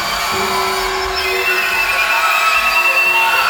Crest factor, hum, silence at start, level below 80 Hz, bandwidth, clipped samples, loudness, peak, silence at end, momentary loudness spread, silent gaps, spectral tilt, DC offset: 12 dB; none; 0 s; -40 dBFS; over 20 kHz; under 0.1%; -13 LUFS; -2 dBFS; 0 s; 6 LU; none; -1 dB/octave; under 0.1%